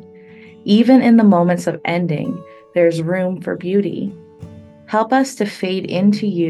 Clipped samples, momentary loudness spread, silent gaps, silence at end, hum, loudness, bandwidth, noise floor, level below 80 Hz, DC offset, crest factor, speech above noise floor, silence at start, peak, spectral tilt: under 0.1%; 13 LU; none; 0 s; none; -16 LUFS; 12.5 kHz; -41 dBFS; -62 dBFS; under 0.1%; 16 dB; 25 dB; 0.65 s; 0 dBFS; -7 dB/octave